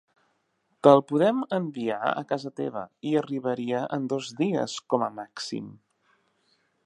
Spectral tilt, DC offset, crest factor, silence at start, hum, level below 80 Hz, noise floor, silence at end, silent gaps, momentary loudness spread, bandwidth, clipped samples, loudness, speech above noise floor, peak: -6 dB/octave; under 0.1%; 24 dB; 0.85 s; none; -78 dBFS; -73 dBFS; 1.15 s; none; 15 LU; 11 kHz; under 0.1%; -26 LUFS; 47 dB; -2 dBFS